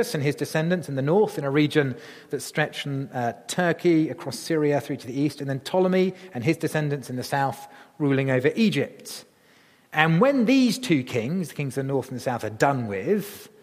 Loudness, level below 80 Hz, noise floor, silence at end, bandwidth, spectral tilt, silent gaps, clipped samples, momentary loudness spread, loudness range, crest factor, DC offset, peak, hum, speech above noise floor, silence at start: -24 LUFS; -68 dBFS; -57 dBFS; 0.15 s; 15.5 kHz; -6 dB/octave; none; under 0.1%; 10 LU; 3 LU; 22 dB; under 0.1%; -2 dBFS; none; 33 dB; 0 s